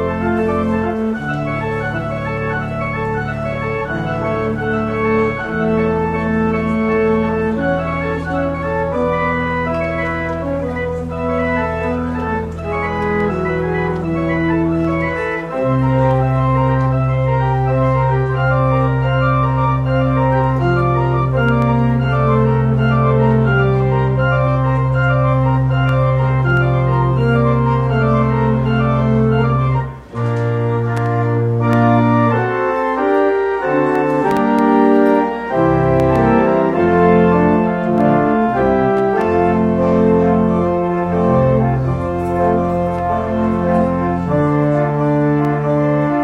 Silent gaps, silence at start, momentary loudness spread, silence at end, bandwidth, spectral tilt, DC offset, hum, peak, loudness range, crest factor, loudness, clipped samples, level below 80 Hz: none; 0 s; 7 LU; 0 s; 6 kHz; -9.5 dB/octave; under 0.1%; none; 0 dBFS; 5 LU; 14 dB; -16 LUFS; under 0.1%; -32 dBFS